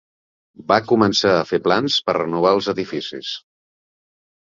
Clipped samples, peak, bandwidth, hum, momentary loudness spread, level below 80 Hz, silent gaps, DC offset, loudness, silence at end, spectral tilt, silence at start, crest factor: under 0.1%; -2 dBFS; 7.6 kHz; none; 13 LU; -58 dBFS; none; under 0.1%; -18 LUFS; 1.15 s; -4.5 dB/octave; 0.6 s; 18 dB